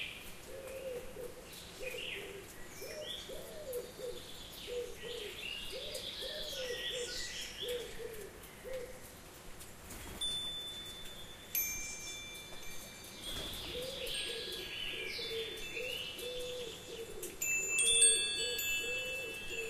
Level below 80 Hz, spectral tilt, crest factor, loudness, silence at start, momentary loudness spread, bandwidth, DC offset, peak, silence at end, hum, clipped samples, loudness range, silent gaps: -58 dBFS; -0.5 dB/octave; 26 dB; -37 LUFS; 0 s; 15 LU; 15.5 kHz; under 0.1%; -14 dBFS; 0 s; none; under 0.1%; 13 LU; none